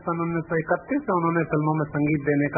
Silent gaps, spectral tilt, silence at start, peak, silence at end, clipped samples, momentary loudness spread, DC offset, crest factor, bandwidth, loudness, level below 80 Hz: none; -15.5 dB/octave; 0 s; -8 dBFS; 0 s; under 0.1%; 3 LU; under 0.1%; 16 dB; 2.6 kHz; -24 LUFS; -54 dBFS